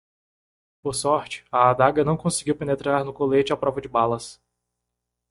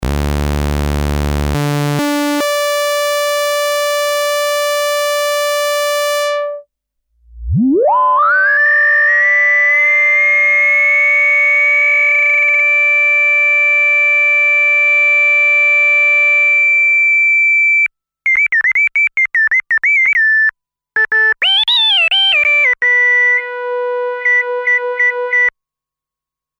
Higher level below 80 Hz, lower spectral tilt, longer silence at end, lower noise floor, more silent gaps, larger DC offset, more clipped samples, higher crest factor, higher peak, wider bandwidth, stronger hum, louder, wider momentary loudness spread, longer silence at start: second, -56 dBFS vs -30 dBFS; first, -5 dB/octave vs -3 dB/octave; second, 0.95 s vs 1.1 s; second, -82 dBFS vs -86 dBFS; neither; neither; neither; first, 20 dB vs 8 dB; about the same, -4 dBFS vs -6 dBFS; second, 11.5 kHz vs over 20 kHz; first, 60 Hz at -45 dBFS vs none; second, -22 LUFS vs -10 LUFS; about the same, 8 LU vs 9 LU; first, 0.85 s vs 0 s